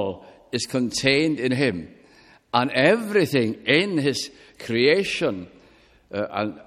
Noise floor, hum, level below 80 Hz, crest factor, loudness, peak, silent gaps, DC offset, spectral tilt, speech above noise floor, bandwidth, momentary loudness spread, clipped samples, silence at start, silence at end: -55 dBFS; none; -58 dBFS; 20 dB; -22 LUFS; -2 dBFS; none; under 0.1%; -4.5 dB/octave; 32 dB; 15.5 kHz; 14 LU; under 0.1%; 0 s; 0.05 s